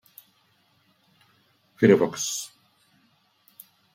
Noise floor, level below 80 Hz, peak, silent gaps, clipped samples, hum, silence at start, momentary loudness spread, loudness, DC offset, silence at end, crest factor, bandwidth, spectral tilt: -65 dBFS; -70 dBFS; -4 dBFS; none; under 0.1%; none; 1.8 s; 15 LU; -22 LUFS; under 0.1%; 1.5 s; 24 dB; 16.5 kHz; -4.5 dB/octave